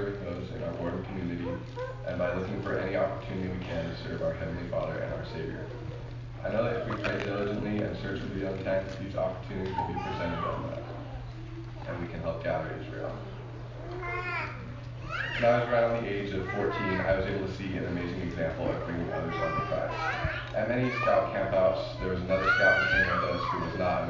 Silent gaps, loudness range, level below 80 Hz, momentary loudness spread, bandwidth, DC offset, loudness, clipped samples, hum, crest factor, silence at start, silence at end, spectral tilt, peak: none; 9 LU; -46 dBFS; 13 LU; 7.6 kHz; under 0.1%; -31 LUFS; under 0.1%; none; 20 dB; 0 s; 0 s; -7 dB/octave; -10 dBFS